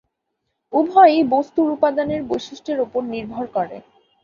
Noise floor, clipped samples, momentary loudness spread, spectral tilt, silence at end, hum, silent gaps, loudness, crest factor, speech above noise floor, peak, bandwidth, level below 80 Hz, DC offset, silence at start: -76 dBFS; under 0.1%; 14 LU; -6 dB/octave; 0.45 s; none; none; -19 LUFS; 18 dB; 57 dB; -2 dBFS; 7.2 kHz; -58 dBFS; under 0.1%; 0.7 s